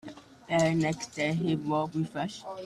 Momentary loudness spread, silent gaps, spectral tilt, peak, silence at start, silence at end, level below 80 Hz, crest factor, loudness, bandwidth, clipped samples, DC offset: 9 LU; none; -6 dB/octave; -14 dBFS; 0.05 s; 0 s; -64 dBFS; 16 dB; -30 LUFS; 12 kHz; under 0.1%; under 0.1%